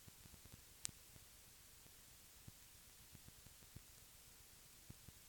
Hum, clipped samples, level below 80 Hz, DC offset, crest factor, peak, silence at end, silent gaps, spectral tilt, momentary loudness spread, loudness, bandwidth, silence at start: none; under 0.1%; -72 dBFS; under 0.1%; 44 dB; -18 dBFS; 0 s; none; -2 dB/octave; 10 LU; -59 LUFS; 19 kHz; 0 s